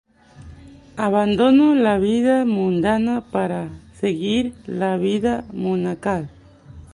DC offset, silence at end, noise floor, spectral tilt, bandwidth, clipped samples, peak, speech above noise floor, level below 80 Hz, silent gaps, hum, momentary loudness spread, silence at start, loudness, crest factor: under 0.1%; 0.1 s; -43 dBFS; -7 dB/octave; 11 kHz; under 0.1%; -4 dBFS; 24 dB; -48 dBFS; none; none; 11 LU; 0.4 s; -20 LUFS; 16 dB